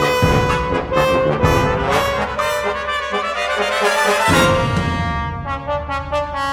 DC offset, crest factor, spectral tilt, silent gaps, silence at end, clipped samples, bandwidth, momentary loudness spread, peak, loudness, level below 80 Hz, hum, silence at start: under 0.1%; 16 dB; -5 dB/octave; none; 0 s; under 0.1%; 19 kHz; 8 LU; -2 dBFS; -17 LUFS; -32 dBFS; none; 0 s